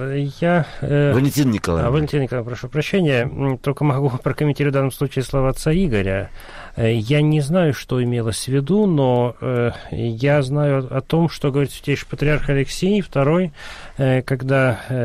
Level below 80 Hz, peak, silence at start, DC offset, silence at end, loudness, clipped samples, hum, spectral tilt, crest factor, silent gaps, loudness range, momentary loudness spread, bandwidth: -36 dBFS; -8 dBFS; 0 s; under 0.1%; 0 s; -19 LUFS; under 0.1%; none; -7 dB/octave; 12 dB; none; 1 LU; 7 LU; 15 kHz